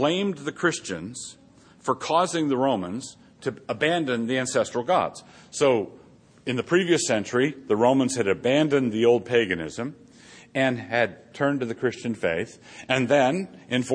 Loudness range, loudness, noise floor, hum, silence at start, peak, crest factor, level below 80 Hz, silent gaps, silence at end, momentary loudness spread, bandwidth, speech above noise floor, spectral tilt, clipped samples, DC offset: 5 LU; -24 LUFS; -49 dBFS; none; 0 s; -6 dBFS; 18 dB; -64 dBFS; none; 0 s; 13 LU; 10.5 kHz; 25 dB; -4.5 dB/octave; under 0.1%; under 0.1%